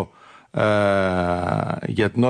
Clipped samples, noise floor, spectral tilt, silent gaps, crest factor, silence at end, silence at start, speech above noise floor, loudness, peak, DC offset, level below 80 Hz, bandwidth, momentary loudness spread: under 0.1%; -48 dBFS; -7 dB/octave; none; 14 dB; 0 s; 0 s; 28 dB; -21 LUFS; -8 dBFS; under 0.1%; -50 dBFS; 10.5 kHz; 8 LU